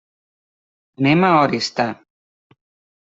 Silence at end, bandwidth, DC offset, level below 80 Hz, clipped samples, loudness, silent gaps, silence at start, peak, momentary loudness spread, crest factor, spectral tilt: 1.1 s; 8 kHz; under 0.1%; -62 dBFS; under 0.1%; -17 LUFS; none; 1 s; -2 dBFS; 10 LU; 18 dB; -6 dB/octave